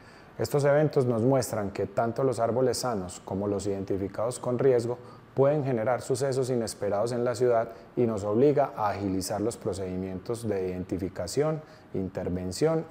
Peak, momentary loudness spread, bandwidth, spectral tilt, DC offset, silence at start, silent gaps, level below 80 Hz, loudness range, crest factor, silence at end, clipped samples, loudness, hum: -10 dBFS; 10 LU; 16 kHz; -6 dB/octave; under 0.1%; 0 s; none; -60 dBFS; 4 LU; 16 dB; 0 s; under 0.1%; -28 LUFS; none